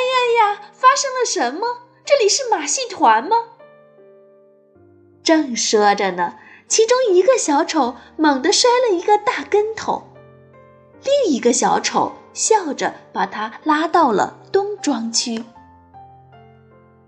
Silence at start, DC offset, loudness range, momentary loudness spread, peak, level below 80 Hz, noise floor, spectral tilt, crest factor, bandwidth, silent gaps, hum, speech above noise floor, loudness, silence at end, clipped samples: 0 s; under 0.1%; 4 LU; 10 LU; -2 dBFS; -66 dBFS; -51 dBFS; -2 dB/octave; 16 dB; 10.5 kHz; none; none; 34 dB; -17 LUFS; 1.05 s; under 0.1%